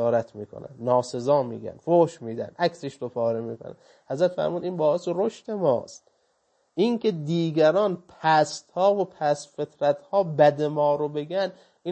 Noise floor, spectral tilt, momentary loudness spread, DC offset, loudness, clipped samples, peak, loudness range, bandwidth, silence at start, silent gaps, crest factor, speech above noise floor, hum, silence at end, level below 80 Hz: -69 dBFS; -6 dB/octave; 14 LU; under 0.1%; -25 LUFS; under 0.1%; -6 dBFS; 4 LU; 8.8 kHz; 0 s; none; 18 dB; 45 dB; none; 0 s; -72 dBFS